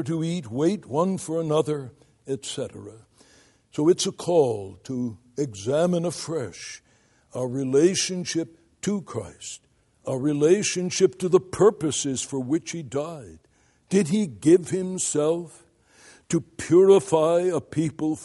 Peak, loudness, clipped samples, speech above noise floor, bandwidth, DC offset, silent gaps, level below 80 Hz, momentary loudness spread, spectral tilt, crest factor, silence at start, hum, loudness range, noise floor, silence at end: -4 dBFS; -24 LUFS; under 0.1%; 38 dB; 11.5 kHz; under 0.1%; none; -64 dBFS; 16 LU; -5 dB/octave; 20 dB; 0 s; none; 5 LU; -62 dBFS; 0 s